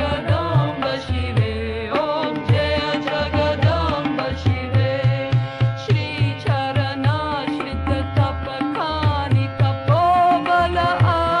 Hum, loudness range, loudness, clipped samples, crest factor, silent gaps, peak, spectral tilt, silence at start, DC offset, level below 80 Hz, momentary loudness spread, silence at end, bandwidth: none; 3 LU; -20 LUFS; under 0.1%; 14 dB; none; -6 dBFS; -7.5 dB/octave; 0 s; under 0.1%; -36 dBFS; 6 LU; 0 s; 10 kHz